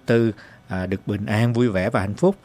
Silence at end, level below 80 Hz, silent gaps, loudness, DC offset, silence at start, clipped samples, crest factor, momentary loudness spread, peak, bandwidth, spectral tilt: 0.1 s; -44 dBFS; none; -22 LUFS; under 0.1%; 0.1 s; under 0.1%; 16 dB; 10 LU; -4 dBFS; 15.5 kHz; -7.5 dB/octave